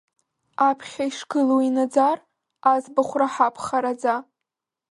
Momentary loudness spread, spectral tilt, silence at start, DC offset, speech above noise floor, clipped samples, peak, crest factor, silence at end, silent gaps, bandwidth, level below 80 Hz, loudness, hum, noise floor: 9 LU; -4 dB/octave; 0.6 s; under 0.1%; 64 dB; under 0.1%; -4 dBFS; 18 dB; 0.7 s; none; 11.5 kHz; -70 dBFS; -22 LUFS; none; -85 dBFS